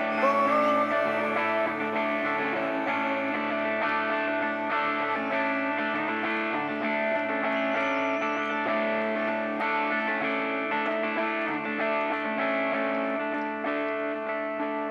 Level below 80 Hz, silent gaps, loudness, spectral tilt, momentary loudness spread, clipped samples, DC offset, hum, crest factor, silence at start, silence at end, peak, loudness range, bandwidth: -82 dBFS; none; -27 LUFS; -5.5 dB/octave; 4 LU; under 0.1%; under 0.1%; none; 16 dB; 0 s; 0 s; -12 dBFS; 1 LU; 12 kHz